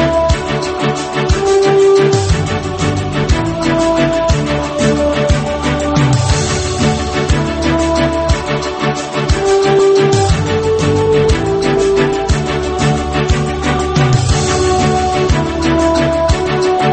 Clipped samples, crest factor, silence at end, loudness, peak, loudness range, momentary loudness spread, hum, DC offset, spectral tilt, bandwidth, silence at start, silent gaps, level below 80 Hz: under 0.1%; 12 dB; 0 s; -13 LUFS; 0 dBFS; 2 LU; 5 LU; none; under 0.1%; -5.5 dB/octave; 8.8 kHz; 0 s; none; -22 dBFS